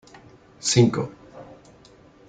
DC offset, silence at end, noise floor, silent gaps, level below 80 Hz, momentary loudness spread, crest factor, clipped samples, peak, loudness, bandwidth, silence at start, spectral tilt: under 0.1%; 0.85 s; -52 dBFS; none; -58 dBFS; 26 LU; 20 dB; under 0.1%; -4 dBFS; -22 LUFS; 9.6 kHz; 0.65 s; -5 dB/octave